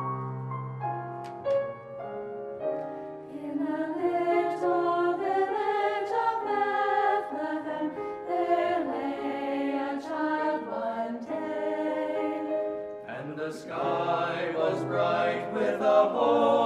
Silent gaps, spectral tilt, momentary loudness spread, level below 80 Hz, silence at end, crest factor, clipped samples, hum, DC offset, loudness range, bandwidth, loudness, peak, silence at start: none; -7 dB/octave; 10 LU; -72 dBFS; 0 s; 18 dB; under 0.1%; none; under 0.1%; 5 LU; 11.5 kHz; -29 LUFS; -12 dBFS; 0 s